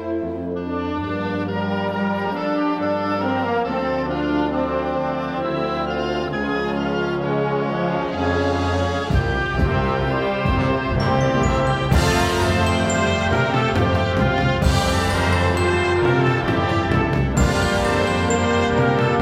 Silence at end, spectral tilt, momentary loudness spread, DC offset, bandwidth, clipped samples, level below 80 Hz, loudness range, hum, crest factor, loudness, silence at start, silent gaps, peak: 0 s; -6 dB/octave; 5 LU; under 0.1%; 16 kHz; under 0.1%; -32 dBFS; 4 LU; none; 16 dB; -20 LUFS; 0 s; none; -2 dBFS